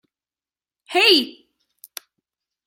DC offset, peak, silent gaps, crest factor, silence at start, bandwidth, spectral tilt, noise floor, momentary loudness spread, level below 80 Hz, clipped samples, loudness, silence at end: under 0.1%; -2 dBFS; none; 22 dB; 0.9 s; 16.5 kHz; -1 dB/octave; under -90 dBFS; 24 LU; -80 dBFS; under 0.1%; -16 LUFS; 1.35 s